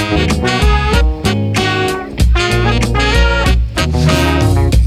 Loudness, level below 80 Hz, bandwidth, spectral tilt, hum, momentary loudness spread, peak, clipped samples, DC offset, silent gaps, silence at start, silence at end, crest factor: -13 LUFS; -16 dBFS; 14.5 kHz; -5.5 dB/octave; none; 3 LU; 0 dBFS; under 0.1%; under 0.1%; none; 0 s; 0 s; 12 dB